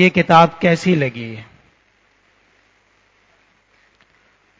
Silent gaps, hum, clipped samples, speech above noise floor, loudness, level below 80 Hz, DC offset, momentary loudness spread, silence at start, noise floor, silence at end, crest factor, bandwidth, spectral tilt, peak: none; none; under 0.1%; 44 dB; -14 LUFS; -56 dBFS; under 0.1%; 20 LU; 0 s; -58 dBFS; 3.15 s; 20 dB; 8 kHz; -6.5 dB/octave; 0 dBFS